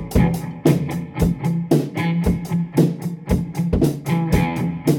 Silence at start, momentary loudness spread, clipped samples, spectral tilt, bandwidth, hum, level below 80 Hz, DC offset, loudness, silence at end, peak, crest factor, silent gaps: 0 s; 4 LU; under 0.1%; -7.5 dB/octave; 18 kHz; none; -32 dBFS; under 0.1%; -20 LUFS; 0 s; -2 dBFS; 16 dB; none